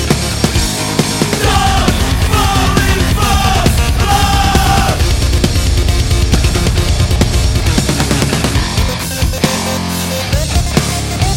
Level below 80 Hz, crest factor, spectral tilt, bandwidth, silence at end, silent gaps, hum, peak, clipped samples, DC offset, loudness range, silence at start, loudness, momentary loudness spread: -16 dBFS; 12 dB; -4.5 dB/octave; 17 kHz; 0 s; none; none; 0 dBFS; under 0.1%; under 0.1%; 3 LU; 0 s; -13 LUFS; 4 LU